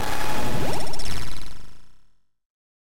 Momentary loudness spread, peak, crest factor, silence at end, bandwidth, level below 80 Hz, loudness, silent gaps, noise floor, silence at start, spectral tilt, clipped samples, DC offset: 14 LU; -10 dBFS; 6 dB; 0.4 s; 16.5 kHz; -36 dBFS; -30 LUFS; 2.46-2.50 s; -52 dBFS; 0 s; -4 dB/octave; under 0.1%; under 0.1%